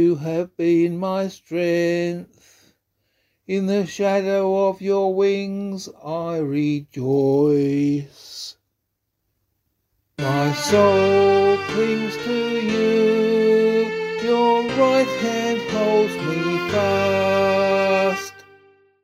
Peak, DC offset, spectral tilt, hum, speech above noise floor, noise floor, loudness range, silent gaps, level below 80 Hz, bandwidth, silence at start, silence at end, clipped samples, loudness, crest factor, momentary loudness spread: -4 dBFS; under 0.1%; -6 dB/octave; none; 57 dB; -76 dBFS; 5 LU; none; -60 dBFS; 15 kHz; 0 s; 0.65 s; under 0.1%; -20 LUFS; 18 dB; 11 LU